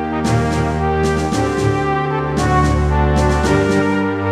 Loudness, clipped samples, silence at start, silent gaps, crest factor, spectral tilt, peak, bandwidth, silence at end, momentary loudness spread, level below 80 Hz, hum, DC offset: -16 LUFS; under 0.1%; 0 s; none; 14 dB; -6.5 dB/octave; 0 dBFS; 13 kHz; 0 s; 3 LU; -24 dBFS; none; 0.1%